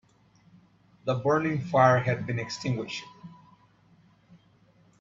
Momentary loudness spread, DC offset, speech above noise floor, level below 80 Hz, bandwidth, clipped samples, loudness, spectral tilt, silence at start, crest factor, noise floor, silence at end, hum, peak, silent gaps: 16 LU; under 0.1%; 35 dB; -64 dBFS; 7.6 kHz; under 0.1%; -27 LUFS; -6.5 dB/octave; 1.05 s; 22 dB; -61 dBFS; 1.65 s; none; -6 dBFS; none